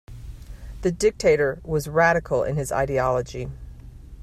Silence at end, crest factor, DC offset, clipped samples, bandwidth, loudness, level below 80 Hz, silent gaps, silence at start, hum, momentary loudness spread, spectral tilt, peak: 0 s; 20 dB; under 0.1%; under 0.1%; 14.5 kHz; -22 LUFS; -40 dBFS; none; 0.1 s; none; 22 LU; -5.5 dB/octave; -4 dBFS